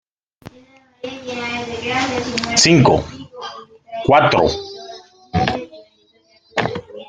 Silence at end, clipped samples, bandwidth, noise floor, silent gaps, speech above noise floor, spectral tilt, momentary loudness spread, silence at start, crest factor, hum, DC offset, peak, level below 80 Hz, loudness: 0.05 s; under 0.1%; 10 kHz; -56 dBFS; none; 40 dB; -4 dB/octave; 21 LU; 0.45 s; 20 dB; none; under 0.1%; 0 dBFS; -46 dBFS; -17 LUFS